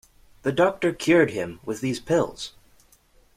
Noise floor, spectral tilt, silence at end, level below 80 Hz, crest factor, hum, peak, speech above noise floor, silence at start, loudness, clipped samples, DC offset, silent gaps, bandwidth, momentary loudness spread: -58 dBFS; -5.5 dB/octave; 0.9 s; -56 dBFS; 18 dB; none; -6 dBFS; 35 dB; 0.45 s; -24 LUFS; under 0.1%; under 0.1%; none; 15 kHz; 12 LU